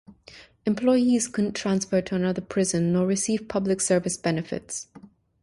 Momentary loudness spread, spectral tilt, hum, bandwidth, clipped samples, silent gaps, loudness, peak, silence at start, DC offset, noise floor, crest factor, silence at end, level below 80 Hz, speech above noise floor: 11 LU; -5 dB/octave; none; 11.5 kHz; under 0.1%; none; -25 LUFS; -10 dBFS; 0.1 s; under 0.1%; -50 dBFS; 16 dB; 0.35 s; -58 dBFS; 26 dB